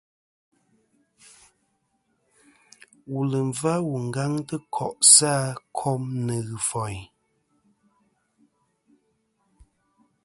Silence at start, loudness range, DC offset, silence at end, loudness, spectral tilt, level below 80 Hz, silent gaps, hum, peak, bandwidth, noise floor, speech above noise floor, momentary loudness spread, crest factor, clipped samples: 3.1 s; 14 LU; under 0.1%; 3.2 s; -22 LUFS; -3 dB/octave; -62 dBFS; none; none; -2 dBFS; 12 kHz; -72 dBFS; 48 dB; 18 LU; 26 dB; under 0.1%